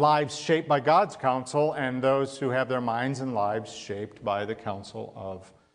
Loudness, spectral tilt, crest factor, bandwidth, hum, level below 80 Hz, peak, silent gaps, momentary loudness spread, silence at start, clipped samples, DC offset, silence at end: -27 LUFS; -5.5 dB/octave; 18 dB; 10.5 kHz; none; -68 dBFS; -10 dBFS; none; 15 LU; 0 s; under 0.1%; under 0.1%; 0.3 s